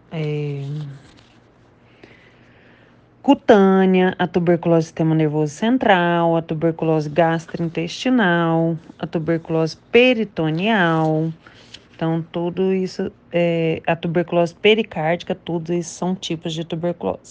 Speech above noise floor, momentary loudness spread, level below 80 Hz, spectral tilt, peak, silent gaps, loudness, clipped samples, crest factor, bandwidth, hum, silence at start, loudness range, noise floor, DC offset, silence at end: 33 dB; 11 LU; -58 dBFS; -6.5 dB/octave; 0 dBFS; none; -19 LUFS; under 0.1%; 20 dB; 8.8 kHz; none; 0.1 s; 4 LU; -52 dBFS; under 0.1%; 0 s